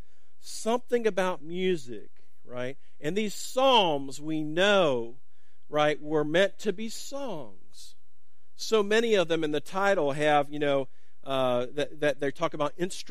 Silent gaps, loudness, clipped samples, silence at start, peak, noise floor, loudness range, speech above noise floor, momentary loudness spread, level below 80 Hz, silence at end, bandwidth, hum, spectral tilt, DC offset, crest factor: none; -28 LUFS; under 0.1%; 0.45 s; -8 dBFS; -74 dBFS; 4 LU; 46 dB; 14 LU; -68 dBFS; 0 s; 15.5 kHz; none; -4 dB/octave; 2%; 20 dB